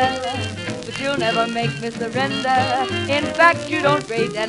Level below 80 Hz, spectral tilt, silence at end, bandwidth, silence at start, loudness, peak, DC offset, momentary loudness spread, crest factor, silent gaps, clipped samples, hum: -52 dBFS; -4.5 dB/octave; 0 s; 11.5 kHz; 0 s; -20 LUFS; 0 dBFS; under 0.1%; 10 LU; 20 dB; none; under 0.1%; none